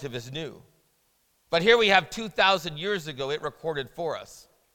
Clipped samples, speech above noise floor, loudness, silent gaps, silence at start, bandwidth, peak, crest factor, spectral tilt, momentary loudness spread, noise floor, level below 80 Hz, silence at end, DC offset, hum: under 0.1%; 43 dB; -25 LUFS; none; 0 s; 17.5 kHz; -4 dBFS; 24 dB; -3.5 dB/octave; 16 LU; -69 dBFS; -58 dBFS; 0.35 s; under 0.1%; none